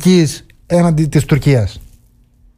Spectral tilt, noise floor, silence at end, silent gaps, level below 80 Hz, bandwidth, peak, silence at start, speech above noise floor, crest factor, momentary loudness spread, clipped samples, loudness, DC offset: -6.5 dB/octave; -49 dBFS; 0.75 s; none; -34 dBFS; 15.5 kHz; -2 dBFS; 0 s; 37 dB; 12 dB; 8 LU; under 0.1%; -14 LUFS; under 0.1%